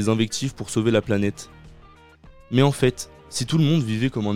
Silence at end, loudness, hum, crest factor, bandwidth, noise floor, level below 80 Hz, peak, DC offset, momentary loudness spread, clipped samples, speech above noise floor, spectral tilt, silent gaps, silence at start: 0 s; -22 LUFS; none; 18 dB; 15.5 kHz; -49 dBFS; -50 dBFS; -4 dBFS; under 0.1%; 11 LU; under 0.1%; 28 dB; -5.5 dB/octave; none; 0 s